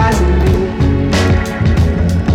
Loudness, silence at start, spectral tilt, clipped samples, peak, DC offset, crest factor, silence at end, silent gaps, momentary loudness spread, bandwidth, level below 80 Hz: -13 LUFS; 0 s; -7 dB/octave; under 0.1%; -2 dBFS; under 0.1%; 8 dB; 0 s; none; 2 LU; 14 kHz; -18 dBFS